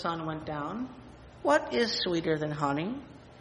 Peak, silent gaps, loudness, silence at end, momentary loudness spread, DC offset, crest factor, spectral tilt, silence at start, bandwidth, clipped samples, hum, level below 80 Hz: -12 dBFS; none; -30 LUFS; 0 s; 15 LU; under 0.1%; 20 dB; -5 dB/octave; 0 s; 10 kHz; under 0.1%; none; -58 dBFS